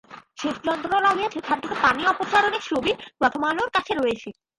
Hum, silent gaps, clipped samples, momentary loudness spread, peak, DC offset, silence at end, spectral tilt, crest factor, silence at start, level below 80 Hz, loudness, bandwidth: none; none; under 0.1%; 7 LU; -6 dBFS; under 0.1%; 0.3 s; -3.5 dB/octave; 18 dB; 0.1 s; -58 dBFS; -23 LUFS; 11.5 kHz